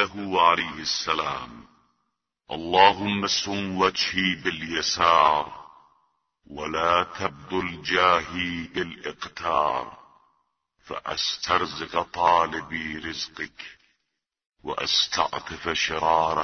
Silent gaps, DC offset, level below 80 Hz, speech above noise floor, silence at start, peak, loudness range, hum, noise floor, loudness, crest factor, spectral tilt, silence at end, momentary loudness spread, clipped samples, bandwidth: 14.46-14.50 s; under 0.1%; -56 dBFS; 56 dB; 0 s; 0 dBFS; 5 LU; none; -81 dBFS; -24 LUFS; 26 dB; -3 dB/octave; 0 s; 15 LU; under 0.1%; 6.6 kHz